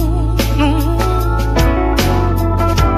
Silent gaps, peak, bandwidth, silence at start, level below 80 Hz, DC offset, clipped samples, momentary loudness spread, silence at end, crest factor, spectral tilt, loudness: none; 0 dBFS; 15 kHz; 0 s; -16 dBFS; 0.4%; under 0.1%; 2 LU; 0 s; 12 dB; -6 dB/octave; -15 LUFS